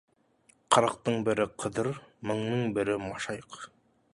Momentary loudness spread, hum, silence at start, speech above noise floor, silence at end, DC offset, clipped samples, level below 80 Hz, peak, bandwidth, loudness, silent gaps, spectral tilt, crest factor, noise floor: 15 LU; none; 0.7 s; 36 dB; 0.45 s; under 0.1%; under 0.1%; -62 dBFS; -6 dBFS; 11.5 kHz; -30 LUFS; none; -5 dB/octave; 24 dB; -66 dBFS